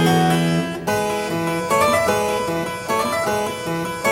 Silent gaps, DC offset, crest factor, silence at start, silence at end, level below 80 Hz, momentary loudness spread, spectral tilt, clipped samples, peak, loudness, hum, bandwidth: none; under 0.1%; 14 dB; 0 s; 0 s; -50 dBFS; 7 LU; -5 dB/octave; under 0.1%; -4 dBFS; -20 LUFS; none; 16.5 kHz